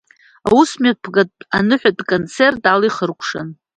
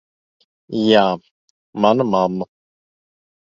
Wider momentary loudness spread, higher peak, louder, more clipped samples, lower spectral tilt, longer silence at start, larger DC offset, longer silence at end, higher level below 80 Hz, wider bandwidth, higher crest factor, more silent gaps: second, 10 LU vs 15 LU; about the same, 0 dBFS vs 0 dBFS; about the same, -16 LUFS vs -18 LUFS; neither; second, -5 dB/octave vs -6.5 dB/octave; second, 0.45 s vs 0.7 s; neither; second, 0.25 s vs 1.15 s; first, -52 dBFS vs -60 dBFS; first, 10.5 kHz vs 7.4 kHz; about the same, 16 dB vs 20 dB; second, none vs 1.31-1.73 s